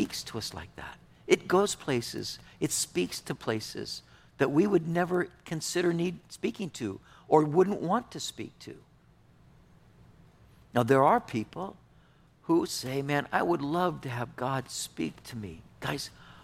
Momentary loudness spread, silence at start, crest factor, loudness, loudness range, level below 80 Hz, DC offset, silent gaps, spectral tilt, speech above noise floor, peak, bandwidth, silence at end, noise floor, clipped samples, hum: 17 LU; 0 s; 22 dB; -30 LUFS; 3 LU; -62 dBFS; under 0.1%; none; -5 dB/octave; 31 dB; -8 dBFS; 16 kHz; 0.05 s; -60 dBFS; under 0.1%; none